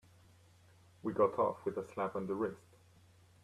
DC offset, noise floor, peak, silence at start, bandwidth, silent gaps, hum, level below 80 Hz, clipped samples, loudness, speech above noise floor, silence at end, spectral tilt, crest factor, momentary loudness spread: under 0.1%; -64 dBFS; -18 dBFS; 1.05 s; 13 kHz; none; none; -76 dBFS; under 0.1%; -37 LUFS; 28 dB; 0.85 s; -8 dB/octave; 20 dB; 10 LU